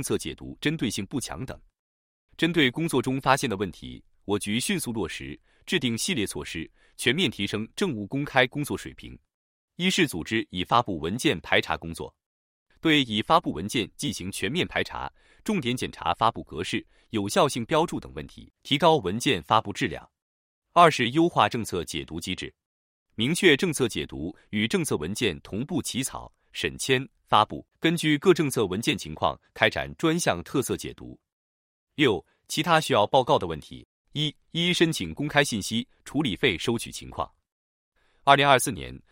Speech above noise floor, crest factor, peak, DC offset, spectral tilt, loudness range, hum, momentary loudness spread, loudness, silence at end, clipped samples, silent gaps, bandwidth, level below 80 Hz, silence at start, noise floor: over 64 dB; 24 dB; -2 dBFS; under 0.1%; -4 dB/octave; 4 LU; none; 15 LU; -25 LUFS; 0.15 s; under 0.1%; 1.79-2.28 s, 9.34-9.68 s, 12.26-12.66 s, 20.22-20.62 s, 22.66-23.06 s, 31.32-31.87 s, 33.85-34.05 s, 37.52-37.92 s; 16.5 kHz; -54 dBFS; 0 s; under -90 dBFS